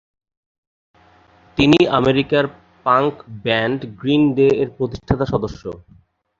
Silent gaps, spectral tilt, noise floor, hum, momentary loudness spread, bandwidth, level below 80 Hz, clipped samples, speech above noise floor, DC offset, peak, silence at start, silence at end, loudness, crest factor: none; -7 dB/octave; -51 dBFS; none; 13 LU; 7.6 kHz; -42 dBFS; under 0.1%; 34 dB; under 0.1%; 0 dBFS; 1.55 s; 0.6 s; -18 LUFS; 18 dB